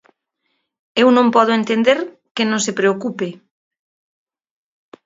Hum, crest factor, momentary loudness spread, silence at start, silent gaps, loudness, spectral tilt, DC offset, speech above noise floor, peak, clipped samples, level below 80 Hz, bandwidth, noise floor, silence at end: none; 18 dB; 13 LU; 0.95 s; 2.31-2.35 s; -16 LUFS; -4 dB/octave; under 0.1%; 56 dB; 0 dBFS; under 0.1%; -68 dBFS; 7.8 kHz; -71 dBFS; 1.7 s